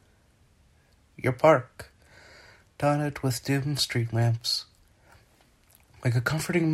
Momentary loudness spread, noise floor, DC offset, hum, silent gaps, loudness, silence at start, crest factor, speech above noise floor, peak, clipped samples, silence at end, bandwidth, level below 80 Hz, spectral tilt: 13 LU; -62 dBFS; under 0.1%; none; none; -26 LUFS; 1.2 s; 22 dB; 37 dB; -6 dBFS; under 0.1%; 0 s; 15.5 kHz; -58 dBFS; -5.5 dB/octave